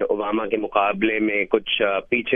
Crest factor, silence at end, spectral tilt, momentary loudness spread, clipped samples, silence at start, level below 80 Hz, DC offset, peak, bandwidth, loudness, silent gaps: 18 dB; 0 s; -8 dB/octave; 3 LU; under 0.1%; 0 s; -54 dBFS; under 0.1%; -4 dBFS; 3.7 kHz; -21 LUFS; none